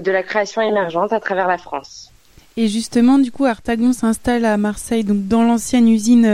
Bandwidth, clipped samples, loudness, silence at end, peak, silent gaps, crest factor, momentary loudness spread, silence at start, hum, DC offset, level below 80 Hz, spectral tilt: 14 kHz; under 0.1%; -17 LUFS; 0 s; -2 dBFS; none; 14 dB; 7 LU; 0 s; none; under 0.1%; -46 dBFS; -5 dB/octave